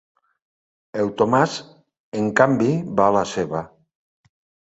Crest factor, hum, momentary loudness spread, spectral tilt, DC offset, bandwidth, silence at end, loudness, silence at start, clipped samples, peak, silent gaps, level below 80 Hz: 22 dB; none; 15 LU; -6 dB/octave; under 0.1%; 8.2 kHz; 1 s; -20 LUFS; 0.95 s; under 0.1%; -2 dBFS; 2.00-2.12 s; -58 dBFS